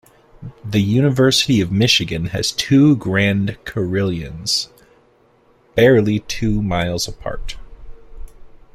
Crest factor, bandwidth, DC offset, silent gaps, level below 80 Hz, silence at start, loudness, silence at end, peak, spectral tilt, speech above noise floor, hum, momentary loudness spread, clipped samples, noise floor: 16 dB; 16 kHz; under 0.1%; none; -38 dBFS; 0.4 s; -17 LUFS; 0.2 s; -2 dBFS; -5 dB/octave; 38 dB; none; 17 LU; under 0.1%; -55 dBFS